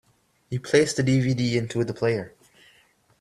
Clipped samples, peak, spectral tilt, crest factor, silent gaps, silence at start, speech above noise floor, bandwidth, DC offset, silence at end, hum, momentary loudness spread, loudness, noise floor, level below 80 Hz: under 0.1%; -4 dBFS; -5.5 dB/octave; 20 dB; none; 0.5 s; 38 dB; 12.5 kHz; under 0.1%; 0.9 s; none; 12 LU; -24 LUFS; -61 dBFS; -58 dBFS